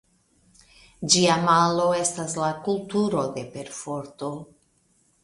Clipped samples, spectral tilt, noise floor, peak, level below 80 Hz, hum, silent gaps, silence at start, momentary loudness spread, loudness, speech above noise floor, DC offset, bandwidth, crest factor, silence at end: under 0.1%; -3.5 dB/octave; -65 dBFS; -4 dBFS; -60 dBFS; none; none; 1 s; 16 LU; -23 LUFS; 41 dB; under 0.1%; 11.5 kHz; 22 dB; 0.8 s